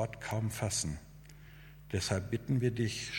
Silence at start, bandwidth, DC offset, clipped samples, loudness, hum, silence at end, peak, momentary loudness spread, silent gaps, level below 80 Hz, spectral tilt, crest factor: 0 s; 17.5 kHz; under 0.1%; under 0.1%; -35 LUFS; none; 0 s; -18 dBFS; 22 LU; none; -54 dBFS; -4.5 dB/octave; 18 dB